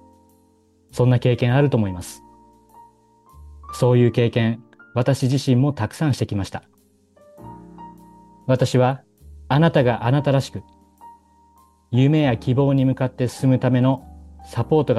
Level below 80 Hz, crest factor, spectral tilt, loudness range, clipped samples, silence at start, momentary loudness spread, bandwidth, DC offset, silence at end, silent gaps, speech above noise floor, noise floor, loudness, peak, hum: -50 dBFS; 16 dB; -7.5 dB/octave; 4 LU; under 0.1%; 0.95 s; 17 LU; 12.5 kHz; under 0.1%; 0 s; none; 40 dB; -58 dBFS; -20 LUFS; -6 dBFS; none